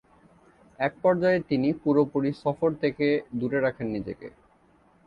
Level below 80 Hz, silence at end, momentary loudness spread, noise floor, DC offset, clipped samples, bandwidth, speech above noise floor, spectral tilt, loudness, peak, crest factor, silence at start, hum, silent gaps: -60 dBFS; 0.8 s; 9 LU; -61 dBFS; under 0.1%; under 0.1%; 5.8 kHz; 35 dB; -9 dB/octave; -26 LUFS; -10 dBFS; 18 dB; 0.8 s; none; none